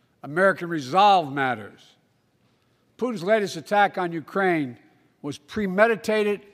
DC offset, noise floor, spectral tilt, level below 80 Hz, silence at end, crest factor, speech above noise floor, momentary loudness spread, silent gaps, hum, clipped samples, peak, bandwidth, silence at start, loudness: under 0.1%; -65 dBFS; -5.5 dB/octave; -66 dBFS; 0.15 s; 22 dB; 43 dB; 14 LU; none; none; under 0.1%; -2 dBFS; 16 kHz; 0.25 s; -23 LUFS